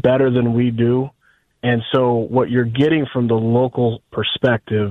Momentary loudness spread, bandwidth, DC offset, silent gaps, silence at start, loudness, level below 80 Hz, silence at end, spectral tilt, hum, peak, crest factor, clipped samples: 5 LU; 4.1 kHz; under 0.1%; none; 0.05 s; -18 LUFS; -52 dBFS; 0 s; -9 dB/octave; none; -4 dBFS; 14 dB; under 0.1%